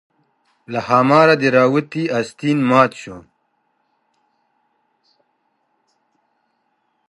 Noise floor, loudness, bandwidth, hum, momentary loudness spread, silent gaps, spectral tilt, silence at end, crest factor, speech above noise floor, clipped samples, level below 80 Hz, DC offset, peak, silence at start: -67 dBFS; -15 LUFS; 11.5 kHz; none; 15 LU; none; -6.5 dB/octave; 3.9 s; 20 dB; 52 dB; under 0.1%; -64 dBFS; under 0.1%; 0 dBFS; 0.7 s